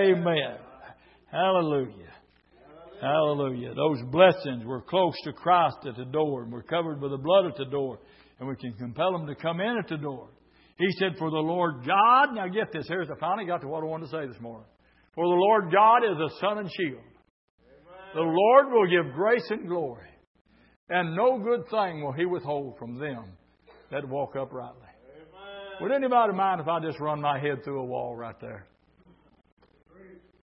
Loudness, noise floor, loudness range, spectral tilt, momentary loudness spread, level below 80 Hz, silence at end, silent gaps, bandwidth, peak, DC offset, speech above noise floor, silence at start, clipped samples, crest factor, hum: -26 LUFS; -60 dBFS; 7 LU; -10 dB/octave; 18 LU; -68 dBFS; 0.45 s; 17.30-17.58 s, 20.27-20.35 s, 20.41-20.45 s, 20.76-20.87 s, 29.52-29.57 s; 5.8 kHz; -4 dBFS; under 0.1%; 35 dB; 0 s; under 0.1%; 22 dB; none